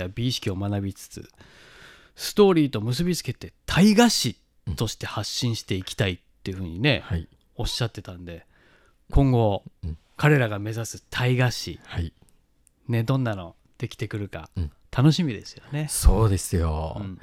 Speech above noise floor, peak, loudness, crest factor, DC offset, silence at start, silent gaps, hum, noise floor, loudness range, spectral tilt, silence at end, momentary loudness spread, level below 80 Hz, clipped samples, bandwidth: 38 dB; -2 dBFS; -24 LUFS; 22 dB; under 0.1%; 0 s; none; none; -62 dBFS; 6 LU; -5.5 dB/octave; 0.05 s; 17 LU; -34 dBFS; under 0.1%; 16.5 kHz